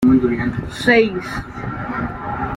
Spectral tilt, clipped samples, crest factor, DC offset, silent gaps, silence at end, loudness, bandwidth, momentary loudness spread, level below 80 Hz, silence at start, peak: -6.5 dB/octave; under 0.1%; 16 dB; under 0.1%; none; 0 s; -19 LUFS; 12 kHz; 13 LU; -38 dBFS; 0 s; -2 dBFS